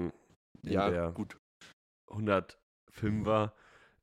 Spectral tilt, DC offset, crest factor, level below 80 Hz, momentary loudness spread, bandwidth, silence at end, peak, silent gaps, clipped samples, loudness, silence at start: -7.5 dB/octave; under 0.1%; 20 dB; -58 dBFS; 16 LU; 12 kHz; 0.55 s; -16 dBFS; 0.36-0.55 s, 1.39-1.60 s, 1.73-2.08 s, 2.63-2.87 s; under 0.1%; -33 LUFS; 0 s